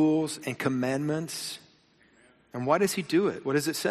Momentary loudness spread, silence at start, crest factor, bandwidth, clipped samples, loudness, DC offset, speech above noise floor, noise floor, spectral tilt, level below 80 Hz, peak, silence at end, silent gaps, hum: 10 LU; 0 s; 18 dB; 15 kHz; under 0.1%; -28 LUFS; under 0.1%; 35 dB; -62 dBFS; -5 dB/octave; -70 dBFS; -10 dBFS; 0 s; none; none